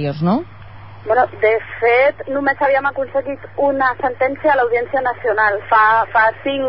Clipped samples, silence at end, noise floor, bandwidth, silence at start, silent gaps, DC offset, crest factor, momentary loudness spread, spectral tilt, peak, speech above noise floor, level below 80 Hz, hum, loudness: under 0.1%; 0 s; -37 dBFS; 5.8 kHz; 0 s; none; 0.8%; 14 dB; 8 LU; -11 dB/octave; -2 dBFS; 21 dB; -52 dBFS; none; -16 LUFS